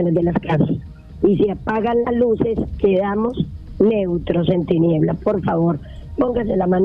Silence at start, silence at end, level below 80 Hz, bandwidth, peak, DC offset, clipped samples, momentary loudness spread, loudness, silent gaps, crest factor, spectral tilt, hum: 0 s; 0 s; -38 dBFS; 5 kHz; -2 dBFS; under 0.1%; under 0.1%; 6 LU; -19 LUFS; none; 16 dB; -10.5 dB/octave; none